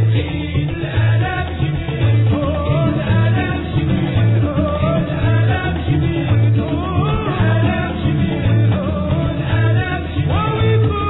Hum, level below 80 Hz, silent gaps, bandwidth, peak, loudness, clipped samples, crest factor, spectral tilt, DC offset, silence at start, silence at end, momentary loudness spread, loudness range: none; -30 dBFS; none; 4.1 kHz; -6 dBFS; -17 LUFS; under 0.1%; 10 dB; -11.5 dB/octave; under 0.1%; 0 s; 0 s; 5 LU; 1 LU